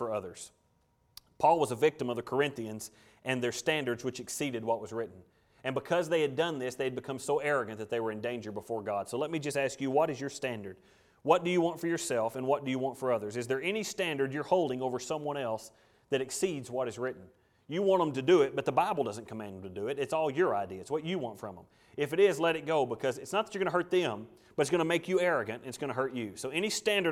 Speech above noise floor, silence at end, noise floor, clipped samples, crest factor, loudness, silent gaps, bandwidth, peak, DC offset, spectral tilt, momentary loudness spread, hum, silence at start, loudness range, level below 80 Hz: 40 dB; 0 s; -71 dBFS; under 0.1%; 22 dB; -32 LUFS; none; 16 kHz; -10 dBFS; under 0.1%; -4.5 dB/octave; 12 LU; none; 0 s; 3 LU; -72 dBFS